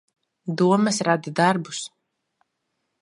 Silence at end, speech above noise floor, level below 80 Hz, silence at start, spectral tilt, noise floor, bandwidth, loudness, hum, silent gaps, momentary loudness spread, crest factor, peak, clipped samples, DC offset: 1.15 s; 56 dB; -74 dBFS; 0.45 s; -5 dB/octave; -77 dBFS; 11.5 kHz; -22 LUFS; none; none; 15 LU; 20 dB; -4 dBFS; under 0.1%; under 0.1%